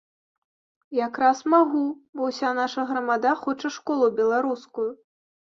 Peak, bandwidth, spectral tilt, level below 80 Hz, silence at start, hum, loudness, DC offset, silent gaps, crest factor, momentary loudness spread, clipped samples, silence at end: -6 dBFS; 7.6 kHz; -4 dB/octave; -74 dBFS; 0.9 s; none; -24 LUFS; under 0.1%; 2.09-2.13 s; 18 dB; 10 LU; under 0.1%; 0.65 s